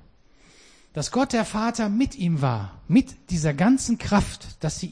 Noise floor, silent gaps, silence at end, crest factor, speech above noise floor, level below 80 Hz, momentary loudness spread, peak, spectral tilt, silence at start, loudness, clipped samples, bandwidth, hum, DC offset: -55 dBFS; none; 0 s; 16 dB; 32 dB; -42 dBFS; 10 LU; -8 dBFS; -5.5 dB/octave; 0.95 s; -24 LUFS; under 0.1%; 10.5 kHz; none; 0.1%